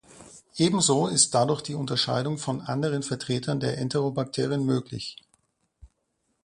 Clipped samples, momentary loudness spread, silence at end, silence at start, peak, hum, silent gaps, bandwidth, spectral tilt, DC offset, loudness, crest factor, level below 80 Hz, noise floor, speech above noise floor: under 0.1%; 9 LU; 0.6 s; 0.1 s; -6 dBFS; none; none; 11.5 kHz; -4 dB/octave; under 0.1%; -26 LUFS; 22 dB; -62 dBFS; -75 dBFS; 50 dB